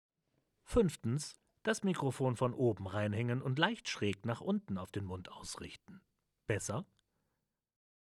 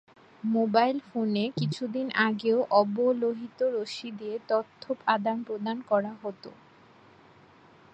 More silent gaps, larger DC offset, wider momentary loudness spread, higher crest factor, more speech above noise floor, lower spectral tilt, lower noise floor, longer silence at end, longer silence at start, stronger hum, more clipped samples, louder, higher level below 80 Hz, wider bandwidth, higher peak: neither; neither; about the same, 13 LU vs 13 LU; about the same, 24 dB vs 20 dB; first, 50 dB vs 28 dB; about the same, -5.5 dB/octave vs -6.5 dB/octave; first, -86 dBFS vs -56 dBFS; about the same, 1.35 s vs 1.4 s; first, 0.7 s vs 0.45 s; neither; neither; second, -37 LUFS vs -28 LUFS; first, -60 dBFS vs -76 dBFS; first, 13 kHz vs 8.6 kHz; second, -14 dBFS vs -8 dBFS